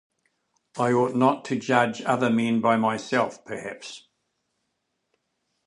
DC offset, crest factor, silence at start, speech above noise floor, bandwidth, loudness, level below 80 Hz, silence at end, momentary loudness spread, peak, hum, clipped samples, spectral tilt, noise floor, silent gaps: under 0.1%; 22 dB; 0.75 s; 54 dB; 11 kHz; -23 LUFS; -72 dBFS; 1.7 s; 16 LU; -4 dBFS; none; under 0.1%; -6 dB/octave; -77 dBFS; none